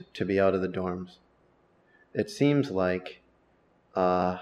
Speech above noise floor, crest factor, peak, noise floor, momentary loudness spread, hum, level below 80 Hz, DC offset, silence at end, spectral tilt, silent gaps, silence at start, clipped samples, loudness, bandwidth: 38 dB; 18 dB; -10 dBFS; -65 dBFS; 12 LU; none; -64 dBFS; under 0.1%; 0 s; -7 dB/octave; none; 0 s; under 0.1%; -28 LUFS; 12 kHz